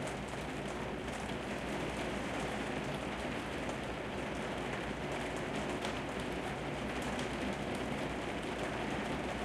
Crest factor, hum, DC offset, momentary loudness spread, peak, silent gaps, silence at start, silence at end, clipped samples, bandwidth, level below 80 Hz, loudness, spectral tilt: 14 dB; none; under 0.1%; 2 LU; -24 dBFS; none; 0 s; 0 s; under 0.1%; 15 kHz; -52 dBFS; -39 LUFS; -5 dB/octave